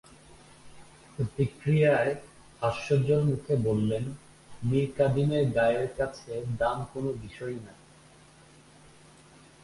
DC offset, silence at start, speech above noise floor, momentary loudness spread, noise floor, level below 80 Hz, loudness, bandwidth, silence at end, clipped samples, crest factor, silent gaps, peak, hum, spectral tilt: under 0.1%; 0.3 s; 28 dB; 14 LU; -55 dBFS; -54 dBFS; -28 LUFS; 11.5 kHz; 1.9 s; under 0.1%; 18 dB; none; -12 dBFS; none; -7.5 dB/octave